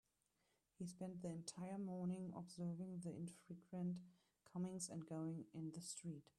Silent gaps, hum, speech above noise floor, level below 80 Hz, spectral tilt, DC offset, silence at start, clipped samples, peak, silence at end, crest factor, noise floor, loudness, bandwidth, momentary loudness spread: none; none; 36 dB; -84 dBFS; -6 dB/octave; under 0.1%; 0.8 s; under 0.1%; -36 dBFS; 0.15 s; 16 dB; -86 dBFS; -51 LUFS; 13 kHz; 7 LU